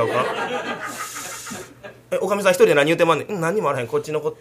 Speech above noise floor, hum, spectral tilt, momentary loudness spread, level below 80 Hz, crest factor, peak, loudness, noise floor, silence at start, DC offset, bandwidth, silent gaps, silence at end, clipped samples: 21 dB; none; -4.5 dB/octave; 15 LU; -62 dBFS; 20 dB; 0 dBFS; -21 LUFS; -41 dBFS; 0 s; under 0.1%; 15.5 kHz; none; 0.05 s; under 0.1%